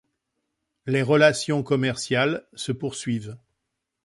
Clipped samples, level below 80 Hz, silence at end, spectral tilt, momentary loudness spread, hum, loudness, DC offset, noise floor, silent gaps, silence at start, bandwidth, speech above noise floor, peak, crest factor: under 0.1%; -62 dBFS; 0.7 s; -5 dB/octave; 13 LU; none; -23 LUFS; under 0.1%; -81 dBFS; none; 0.85 s; 11.5 kHz; 58 dB; -4 dBFS; 20 dB